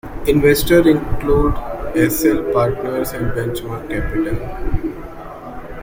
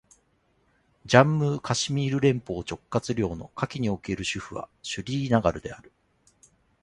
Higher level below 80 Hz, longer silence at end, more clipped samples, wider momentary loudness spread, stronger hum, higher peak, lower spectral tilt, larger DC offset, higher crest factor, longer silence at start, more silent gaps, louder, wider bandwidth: first, -28 dBFS vs -52 dBFS; second, 0 s vs 1.05 s; neither; first, 18 LU vs 14 LU; neither; about the same, -2 dBFS vs -2 dBFS; about the same, -6 dB/octave vs -5.5 dB/octave; neither; second, 16 dB vs 24 dB; second, 0.05 s vs 1.05 s; neither; first, -18 LUFS vs -26 LUFS; first, 16.5 kHz vs 11 kHz